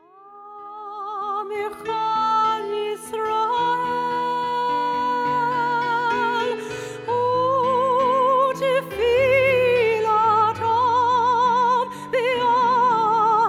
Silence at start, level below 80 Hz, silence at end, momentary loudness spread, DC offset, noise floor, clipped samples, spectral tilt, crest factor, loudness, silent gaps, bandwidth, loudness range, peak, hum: 0.25 s; -56 dBFS; 0 s; 10 LU; under 0.1%; -44 dBFS; under 0.1%; -4.5 dB/octave; 12 dB; -20 LUFS; none; 15 kHz; 5 LU; -8 dBFS; none